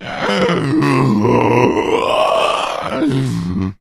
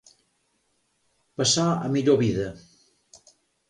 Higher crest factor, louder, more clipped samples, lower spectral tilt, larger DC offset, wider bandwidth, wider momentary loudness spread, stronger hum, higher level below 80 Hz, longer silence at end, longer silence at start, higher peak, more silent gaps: about the same, 14 dB vs 18 dB; first, -15 LUFS vs -23 LUFS; neither; first, -6.5 dB/octave vs -4.5 dB/octave; neither; first, 14 kHz vs 11.5 kHz; second, 6 LU vs 12 LU; neither; first, -44 dBFS vs -56 dBFS; second, 0.1 s vs 1.1 s; second, 0 s vs 1.4 s; first, 0 dBFS vs -8 dBFS; neither